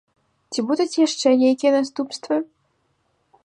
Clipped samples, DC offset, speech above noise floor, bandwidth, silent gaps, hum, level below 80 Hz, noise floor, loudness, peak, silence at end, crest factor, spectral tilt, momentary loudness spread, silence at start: under 0.1%; under 0.1%; 48 dB; 10.5 kHz; none; none; -76 dBFS; -68 dBFS; -20 LUFS; -6 dBFS; 1 s; 16 dB; -3.5 dB/octave; 12 LU; 0.5 s